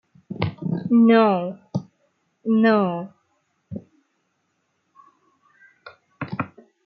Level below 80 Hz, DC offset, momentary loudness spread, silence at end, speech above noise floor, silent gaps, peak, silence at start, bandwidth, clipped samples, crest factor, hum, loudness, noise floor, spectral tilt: -66 dBFS; under 0.1%; 23 LU; 0.4 s; 54 dB; none; -6 dBFS; 0.3 s; 5.8 kHz; under 0.1%; 18 dB; none; -21 LUFS; -71 dBFS; -9 dB/octave